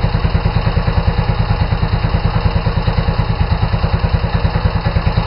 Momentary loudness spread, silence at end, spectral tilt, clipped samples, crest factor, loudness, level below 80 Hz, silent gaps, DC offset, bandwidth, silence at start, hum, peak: 1 LU; 0 s; -10 dB/octave; under 0.1%; 12 dB; -16 LUFS; -18 dBFS; none; under 0.1%; 5.6 kHz; 0 s; none; -2 dBFS